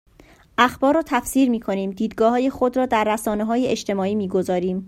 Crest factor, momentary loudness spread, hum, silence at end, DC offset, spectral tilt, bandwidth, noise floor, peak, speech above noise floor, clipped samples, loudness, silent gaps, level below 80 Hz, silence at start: 20 dB; 5 LU; none; 0 s; under 0.1%; -5 dB/octave; 16 kHz; -51 dBFS; -2 dBFS; 31 dB; under 0.1%; -21 LUFS; none; -50 dBFS; 0.6 s